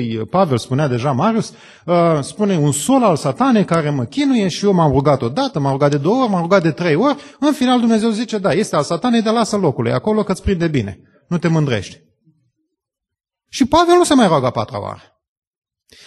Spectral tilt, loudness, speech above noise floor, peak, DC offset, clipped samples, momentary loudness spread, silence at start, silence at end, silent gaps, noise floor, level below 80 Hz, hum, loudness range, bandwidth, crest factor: -6 dB/octave; -16 LUFS; 64 dB; 0 dBFS; under 0.1%; under 0.1%; 7 LU; 0 s; 1.1 s; none; -79 dBFS; -44 dBFS; none; 4 LU; 12.5 kHz; 16 dB